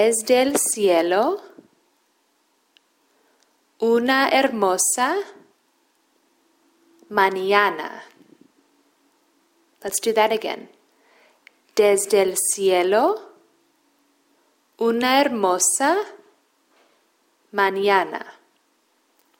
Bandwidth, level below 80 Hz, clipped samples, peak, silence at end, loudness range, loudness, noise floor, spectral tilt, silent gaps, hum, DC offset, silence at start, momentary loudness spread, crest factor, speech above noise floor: 16.5 kHz; -72 dBFS; under 0.1%; -2 dBFS; 1.1 s; 5 LU; -20 LUFS; -66 dBFS; -2 dB/octave; none; none; under 0.1%; 0 s; 13 LU; 20 dB; 46 dB